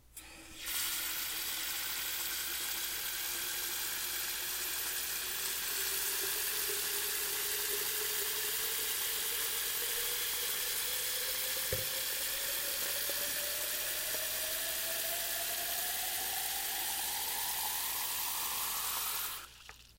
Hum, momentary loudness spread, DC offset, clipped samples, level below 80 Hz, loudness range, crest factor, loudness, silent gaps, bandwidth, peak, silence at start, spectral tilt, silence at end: none; 2 LU; under 0.1%; under 0.1%; -64 dBFS; 2 LU; 18 dB; -33 LUFS; none; 16 kHz; -18 dBFS; 0.15 s; 1 dB/octave; 0.05 s